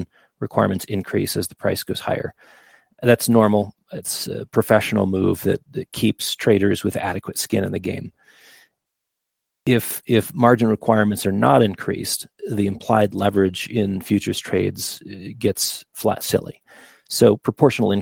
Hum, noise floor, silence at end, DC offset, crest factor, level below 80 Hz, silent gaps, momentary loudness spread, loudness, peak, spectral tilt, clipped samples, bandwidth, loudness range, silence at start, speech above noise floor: none; -80 dBFS; 0 s; under 0.1%; 20 dB; -58 dBFS; none; 11 LU; -20 LUFS; 0 dBFS; -5 dB/octave; under 0.1%; over 20 kHz; 5 LU; 0 s; 61 dB